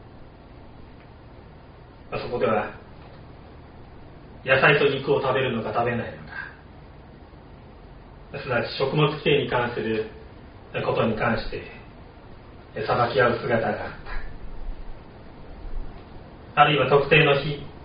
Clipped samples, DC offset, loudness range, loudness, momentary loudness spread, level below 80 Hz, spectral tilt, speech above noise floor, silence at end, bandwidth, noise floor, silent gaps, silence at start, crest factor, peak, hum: under 0.1%; under 0.1%; 8 LU; -23 LUFS; 27 LU; -42 dBFS; -3.5 dB/octave; 24 dB; 0 s; 5.2 kHz; -46 dBFS; none; 0 s; 22 dB; -4 dBFS; none